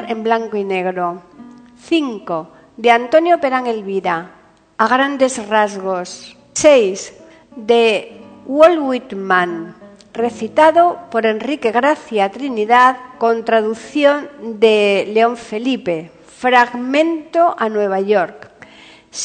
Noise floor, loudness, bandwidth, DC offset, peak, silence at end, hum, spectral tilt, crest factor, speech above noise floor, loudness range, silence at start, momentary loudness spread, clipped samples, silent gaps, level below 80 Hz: -43 dBFS; -15 LUFS; 9.4 kHz; under 0.1%; 0 dBFS; 0 s; none; -4 dB/octave; 16 dB; 28 dB; 3 LU; 0 s; 13 LU; under 0.1%; none; -62 dBFS